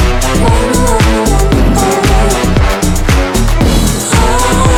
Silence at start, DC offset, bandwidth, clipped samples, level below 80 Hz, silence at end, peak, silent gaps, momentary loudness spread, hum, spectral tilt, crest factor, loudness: 0 s; under 0.1%; 17 kHz; under 0.1%; -12 dBFS; 0 s; 0 dBFS; none; 2 LU; none; -5 dB/octave; 8 dB; -10 LUFS